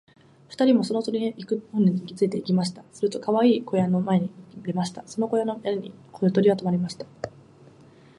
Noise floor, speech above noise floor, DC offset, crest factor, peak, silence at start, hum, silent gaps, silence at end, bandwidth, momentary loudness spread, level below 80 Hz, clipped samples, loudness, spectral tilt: -52 dBFS; 28 dB; under 0.1%; 16 dB; -8 dBFS; 0.5 s; none; none; 0.9 s; 11.5 kHz; 13 LU; -68 dBFS; under 0.1%; -24 LUFS; -7 dB/octave